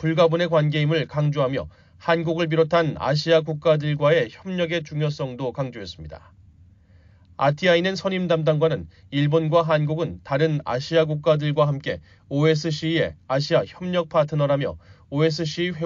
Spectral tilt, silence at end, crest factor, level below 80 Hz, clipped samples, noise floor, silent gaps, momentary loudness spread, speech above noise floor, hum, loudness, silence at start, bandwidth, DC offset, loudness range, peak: -5 dB/octave; 0 s; 16 dB; -54 dBFS; under 0.1%; -52 dBFS; none; 10 LU; 31 dB; none; -22 LUFS; 0 s; 7.4 kHz; under 0.1%; 4 LU; -6 dBFS